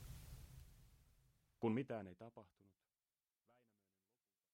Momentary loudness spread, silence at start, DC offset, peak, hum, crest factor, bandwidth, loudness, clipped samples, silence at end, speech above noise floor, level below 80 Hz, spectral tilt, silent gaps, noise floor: 22 LU; 0 s; under 0.1%; -30 dBFS; none; 22 dB; 16.5 kHz; -46 LUFS; under 0.1%; 2.1 s; over 44 dB; -68 dBFS; -7.5 dB/octave; none; under -90 dBFS